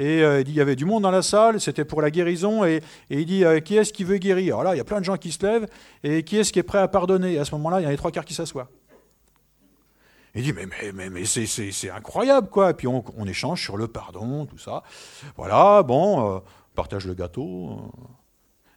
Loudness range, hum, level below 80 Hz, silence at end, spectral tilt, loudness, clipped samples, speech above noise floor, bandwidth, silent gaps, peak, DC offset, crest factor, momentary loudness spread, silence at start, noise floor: 9 LU; none; -52 dBFS; 0.65 s; -5 dB/octave; -22 LUFS; under 0.1%; 41 dB; 16.5 kHz; none; -2 dBFS; under 0.1%; 22 dB; 16 LU; 0 s; -63 dBFS